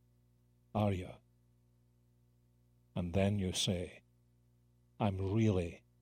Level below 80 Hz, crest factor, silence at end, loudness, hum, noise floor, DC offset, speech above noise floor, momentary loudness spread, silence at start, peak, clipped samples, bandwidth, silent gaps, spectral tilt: -60 dBFS; 20 dB; 0.25 s; -36 LUFS; 60 Hz at -65 dBFS; -70 dBFS; under 0.1%; 36 dB; 12 LU; 0.75 s; -18 dBFS; under 0.1%; 15 kHz; none; -5.5 dB/octave